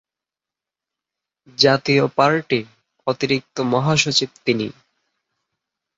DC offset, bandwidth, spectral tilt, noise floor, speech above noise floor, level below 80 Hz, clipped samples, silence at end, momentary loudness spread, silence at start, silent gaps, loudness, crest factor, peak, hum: under 0.1%; 7.8 kHz; -4.5 dB/octave; -88 dBFS; 69 dB; -60 dBFS; under 0.1%; 1.25 s; 9 LU; 1.6 s; none; -19 LUFS; 20 dB; -2 dBFS; none